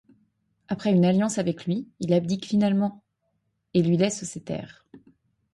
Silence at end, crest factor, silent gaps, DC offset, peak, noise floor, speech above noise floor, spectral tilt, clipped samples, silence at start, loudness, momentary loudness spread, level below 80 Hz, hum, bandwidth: 0.55 s; 16 dB; none; under 0.1%; -10 dBFS; -75 dBFS; 51 dB; -6.5 dB/octave; under 0.1%; 0.7 s; -25 LUFS; 13 LU; -64 dBFS; none; 11.5 kHz